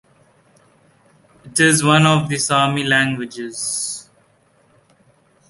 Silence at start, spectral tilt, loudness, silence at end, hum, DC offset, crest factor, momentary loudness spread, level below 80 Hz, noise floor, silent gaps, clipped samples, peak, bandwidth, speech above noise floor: 1.45 s; -3.5 dB/octave; -16 LUFS; 1.45 s; none; under 0.1%; 18 dB; 13 LU; -56 dBFS; -57 dBFS; none; under 0.1%; -2 dBFS; 12 kHz; 40 dB